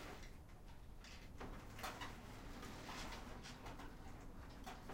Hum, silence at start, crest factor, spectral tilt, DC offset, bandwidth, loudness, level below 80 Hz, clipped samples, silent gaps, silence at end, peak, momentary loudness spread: none; 0 s; 18 dB; -4 dB/octave; under 0.1%; 16 kHz; -54 LUFS; -58 dBFS; under 0.1%; none; 0 s; -36 dBFS; 9 LU